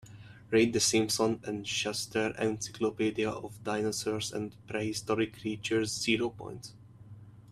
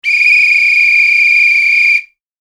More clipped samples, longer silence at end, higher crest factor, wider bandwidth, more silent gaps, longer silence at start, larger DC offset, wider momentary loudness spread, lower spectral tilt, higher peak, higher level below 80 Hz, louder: neither; second, 0 s vs 0.4 s; first, 18 dB vs 10 dB; first, 14.5 kHz vs 13 kHz; neither; about the same, 0.05 s vs 0.05 s; neither; first, 12 LU vs 2 LU; first, -3.5 dB/octave vs 7.5 dB/octave; second, -14 dBFS vs 0 dBFS; first, -64 dBFS vs -78 dBFS; second, -31 LUFS vs -6 LUFS